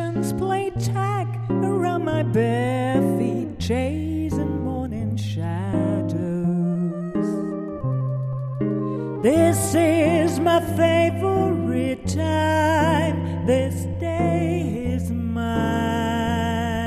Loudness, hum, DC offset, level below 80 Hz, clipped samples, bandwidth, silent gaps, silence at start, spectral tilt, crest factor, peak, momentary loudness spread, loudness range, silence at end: -22 LUFS; none; under 0.1%; -44 dBFS; under 0.1%; 14 kHz; none; 0 s; -6.5 dB/octave; 16 dB; -6 dBFS; 8 LU; 5 LU; 0 s